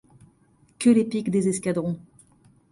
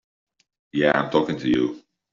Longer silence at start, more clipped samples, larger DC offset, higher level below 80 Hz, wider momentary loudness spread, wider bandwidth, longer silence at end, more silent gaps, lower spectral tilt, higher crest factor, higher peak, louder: about the same, 0.8 s vs 0.75 s; neither; neither; second, -64 dBFS vs -56 dBFS; about the same, 10 LU vs 10 LU; first, 11.5 kHz vs 7.4 kHz; first, 0.7 s vs 0.35 s; neither; first, -6 dB/octave vs -4 dB/octave; about the same, 18 dB vs 20 dB; second, -8 dBFS vs -4 dBFS; about the same, -23 LUFS vs -22 LUFS